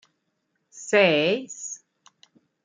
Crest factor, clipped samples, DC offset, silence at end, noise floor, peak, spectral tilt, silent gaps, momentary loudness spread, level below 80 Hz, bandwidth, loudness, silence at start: 22 dB; under 0.1%; under 0.1%; 0.9 s; -75 dBFS; -6 dBFS; -3.5 dB/octave; none; 21 LU; -78 dBFS; 9.6 kHz; -21 LUFS; 0.75 s